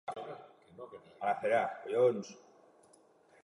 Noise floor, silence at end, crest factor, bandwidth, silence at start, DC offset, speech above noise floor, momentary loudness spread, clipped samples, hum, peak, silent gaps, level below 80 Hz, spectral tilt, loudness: -65 dBFS; 1.05 s; 20 dB; 11.5 kHz; 0.05 s; under 0.1%; 32 dB; 21 LU; under 0.1%; none; -16 dBFS; none; -82 dBFS; -5.5 dB/octave; -33 LUFS